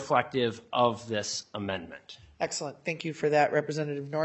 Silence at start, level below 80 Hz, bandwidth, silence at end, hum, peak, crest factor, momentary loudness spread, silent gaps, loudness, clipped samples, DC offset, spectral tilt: 0 s; -70 dBFS; 8.4 kHz; 0 s; none; -8 dBFS; 22 dB; 10 LU; none; -30 LUFS; under 0.1%; under 0.1%; -4 dB/octave